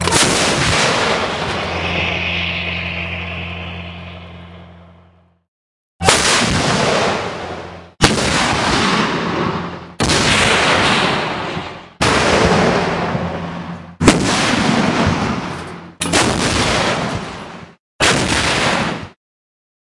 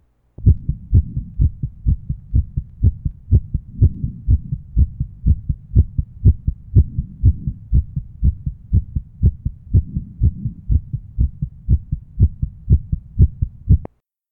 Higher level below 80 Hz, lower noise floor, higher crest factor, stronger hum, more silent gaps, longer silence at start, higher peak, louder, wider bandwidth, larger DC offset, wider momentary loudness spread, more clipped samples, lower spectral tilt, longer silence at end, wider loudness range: second, -36 dBFS vs -22 dBFS; first, -50 dBFS vs -39 dBFS; about the same, 18 dB vs 18 dB; neither; first, 5.48-5.99 s, 17.79-17.99 s vs none; second, 0 s vs 0.4 s; about the same, 0 dBFS vs 0 dBFS; first, -15 LUFS vs -20 LUFS; first, 12 kHz vs 0.9 kHz; neither; first, 16 LU vs 11 LU; neither; second, -3.5 dB/octave vs -15.5 dB/octave; first, 0.9 s vs 0.45 s; first, 6 LU vs 2 LU